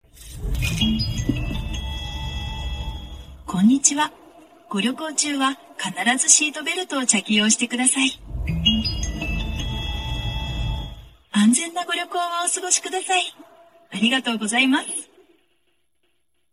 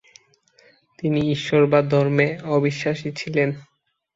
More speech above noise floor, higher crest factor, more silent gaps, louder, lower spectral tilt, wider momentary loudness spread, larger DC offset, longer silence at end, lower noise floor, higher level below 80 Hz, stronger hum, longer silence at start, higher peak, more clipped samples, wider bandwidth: first, 51 dB vs 38 dB; first, 24 dB vs 18 dB; neither; about the same, -21 LUFS vs -21 LUFS; second, -2.5 dB/octave vs -7 dB/octave; first, 13 LU vs 9 LU; neither; first, 1.5 s vs 0.55 s; first, -72 dBFS vs -58 dBFS; first, -34 dBFS vs -58 dBFS; neither; second, 0.15 s vs 1 s; first, 0 dBFS vs -4 dBFS; neither; first, 15.5 kHz vs 7.8 kHz